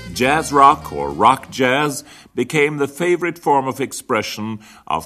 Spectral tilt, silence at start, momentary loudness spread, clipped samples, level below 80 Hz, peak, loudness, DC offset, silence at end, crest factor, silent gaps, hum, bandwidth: -4.5 dB/octave; 0 s; 14 LU; under 0.1%; -48 dBFS; 0 dBFS; -17 LUFS; under 0.1%; 0 s; 18 dB; none; none; 14 kHz